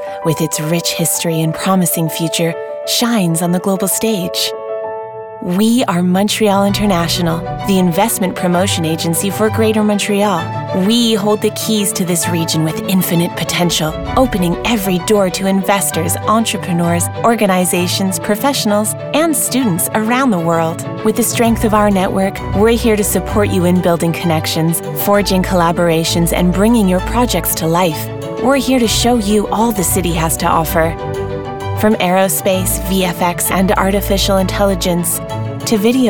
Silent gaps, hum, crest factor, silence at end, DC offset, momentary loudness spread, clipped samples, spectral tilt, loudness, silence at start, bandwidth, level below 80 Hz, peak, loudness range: none; none; 14 dB; 0 s; under 0.1%; 5 LU; under 0.1%; -4.5 dB/octave; -14 LUFS; 0 s; over 20 kHz; -32 dBFS; 0 dBFS; 2 LU